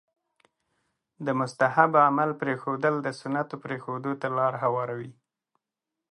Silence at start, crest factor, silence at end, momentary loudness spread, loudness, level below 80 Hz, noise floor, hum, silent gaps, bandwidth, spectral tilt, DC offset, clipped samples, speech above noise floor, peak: 1.2 s; 24 dB; 1 s; 14 LU; -26 LUFS; -78 dBFS; -87 dBFS; none; none; 11 kHz; -7 dB/octave; under 0.1%; under 0.1%; 61 dB; -2 dBFS